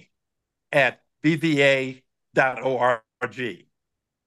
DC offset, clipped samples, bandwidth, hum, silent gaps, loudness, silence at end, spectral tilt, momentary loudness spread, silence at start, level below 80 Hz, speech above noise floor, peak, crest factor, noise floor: under 0.1%; under 0.1%; 12.5 kHz; none; none; -23 LUFS; 0.7 s; -5.5 dB/octave; 13 LU; 0.7 s; -72 dBFS; 61 dB; -4 dBFS; 20 dB; -82 dBFS